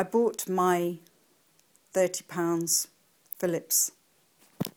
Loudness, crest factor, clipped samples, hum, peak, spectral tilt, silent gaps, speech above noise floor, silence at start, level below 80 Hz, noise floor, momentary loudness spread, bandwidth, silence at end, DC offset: -28 LUFS; 20 dB; under 0.1%; none; -10 dBFS; -3.5 dB/octave; none; 38 dB; 0 s; -76 dBFS; -66 dBFS; 11 LU; 19.5 kHz; 0.05 s; under 0.1%